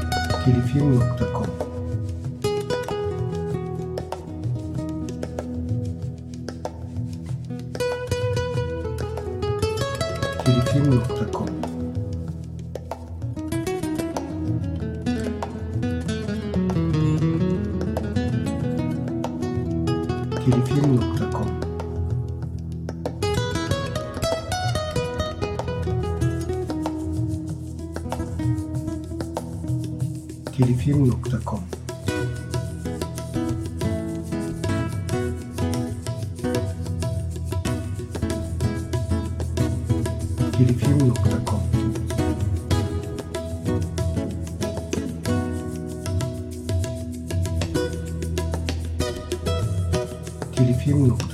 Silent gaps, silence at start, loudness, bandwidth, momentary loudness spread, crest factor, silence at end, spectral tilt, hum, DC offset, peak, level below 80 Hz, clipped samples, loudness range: none; 0 s; -25 LUFS; 14.5 kHz; 11 LU; 20 dB; 0 s; -7 dB/octave; none; under 0.1%; -4 dBFS; -38 dBFS; under 0.1%; 5 LU